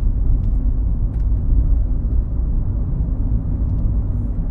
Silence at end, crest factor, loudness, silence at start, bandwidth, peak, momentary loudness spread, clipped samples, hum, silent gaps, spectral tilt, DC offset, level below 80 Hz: 0 s; 12 dB; -22 LUFS; 0 s; 1.6 kHz; -6 dBFS; 3 LU; under 0.1%; none; none; -12.5 dB/octave; under 0.1%; -18 dBFS